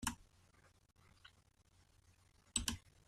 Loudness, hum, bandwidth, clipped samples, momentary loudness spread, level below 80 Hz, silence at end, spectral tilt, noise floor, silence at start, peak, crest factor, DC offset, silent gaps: -42 LUFS; none; 13.5 kHz; under 0.1%; 24 LU; -60 dBFS; 0.3 s; -1.5 dB/octave; -72 dBFS; 0 s; -18 dBFS; 32 dB; under 0.1%; none